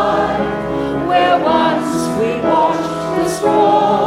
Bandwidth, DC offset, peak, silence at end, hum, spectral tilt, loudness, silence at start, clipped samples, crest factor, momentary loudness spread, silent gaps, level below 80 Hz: 15.5 kHz; under 0.1%; -2 dBFS; 0 s; none; -5.5 dB/octave; -15 LUFS; 0 s; under 0.1%; 12 dB; 7 LU; none; -42 dBFS